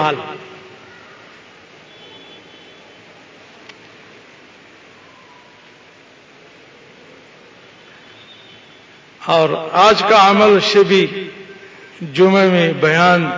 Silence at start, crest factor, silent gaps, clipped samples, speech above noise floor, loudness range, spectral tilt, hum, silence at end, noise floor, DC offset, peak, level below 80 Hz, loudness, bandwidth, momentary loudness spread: 0 s; 16 dB; none; under 0.1%; 32 dB; 12 LU; -5 dB/octave; none; 0 s; -45 dBFS; under 0.1%; 0 dBFS; -60 dBFS; -12 LUFS; 7.6 kHz; 25 LU